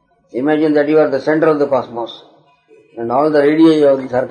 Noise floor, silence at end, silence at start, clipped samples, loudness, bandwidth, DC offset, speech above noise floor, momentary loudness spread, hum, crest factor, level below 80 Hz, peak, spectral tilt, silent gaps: -49 dBFS; 0 s; 0.35 s; under 0.1%; -13 LUFS; 9.4 kHz; under 0.1%; 36 dB; 16 LU; none; 12 dB; -62 dBFS; -2 dBFS; -7.5 dB/octave; none